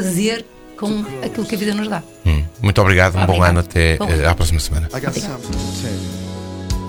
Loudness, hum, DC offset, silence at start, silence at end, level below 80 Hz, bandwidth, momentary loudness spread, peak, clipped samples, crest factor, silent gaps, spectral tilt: -18 LUFS; none; under 0.1%; 0 s; 0 s; -26 dBFS; 19 kHz; 12 LU; 0 dBFS; under 0.1%; 18 dB; none; -5.5 dB/octave